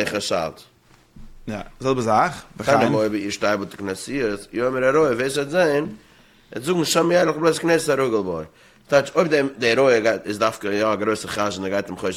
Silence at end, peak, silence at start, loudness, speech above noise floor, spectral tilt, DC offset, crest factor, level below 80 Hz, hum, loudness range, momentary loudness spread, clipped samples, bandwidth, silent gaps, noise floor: 0 s; -4 dBFS; 0 s; -21 LUFS; 27 dB; -4.5 dB/octave; under 0.1%; 18 dB; -52 dBFS; none; 3 LU; 12 LU; under 0.1%; 16 kHz; none; -48 dBFS